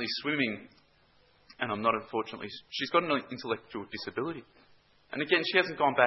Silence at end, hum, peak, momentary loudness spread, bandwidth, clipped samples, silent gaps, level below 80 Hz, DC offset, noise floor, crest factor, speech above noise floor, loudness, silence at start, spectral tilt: 0 s; none; -6 dBFS; 13 LU; 6 kHz; under 0.1%; none; -72 dBFS; under 0.1%; -65 dBFS; 26 dB; 34 dB; -31 LUFS; 0 s; -1.5 dB/octave